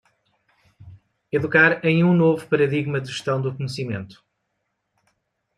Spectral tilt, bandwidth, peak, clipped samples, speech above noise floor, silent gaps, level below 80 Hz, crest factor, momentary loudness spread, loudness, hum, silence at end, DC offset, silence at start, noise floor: -7 dB/octave; 11 kHz; -2 dBFS; under 0.1%; 55 dB; none; -64 dBFS; 20 dB; 13 LU; -20 LUFS; none; 1.45 s; under 0.1%; 0.8 s; -76 dBFS